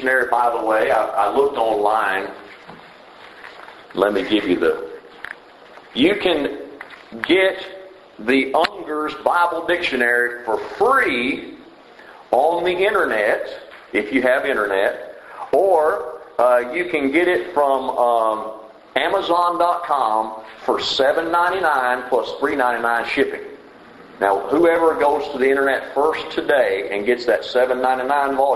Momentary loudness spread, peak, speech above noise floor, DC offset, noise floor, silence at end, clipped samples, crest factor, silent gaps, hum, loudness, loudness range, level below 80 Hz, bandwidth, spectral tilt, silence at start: 16 LU; 0 dBFS; 25 dB; under 0.1%; -43 dBFS; 0 s; under 0.1%; 18 dB; none; none; -19 LUFS; 3 LU; -56 dBFS; 12.5 kHz; -4 dB/octave; 0 s